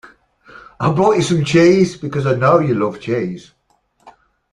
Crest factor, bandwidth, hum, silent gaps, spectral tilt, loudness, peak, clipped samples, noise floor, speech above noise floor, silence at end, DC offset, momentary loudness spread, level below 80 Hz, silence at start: 16 dB; 11.5 kHz; none; none; -6.5 dB/octave; -15 LUFS; -2 dBFS; under 0.1%; -60 dBFS; 46 dB; 0.4 s; under 0.1%; 10 LU; -52 dBFS; 0.8 s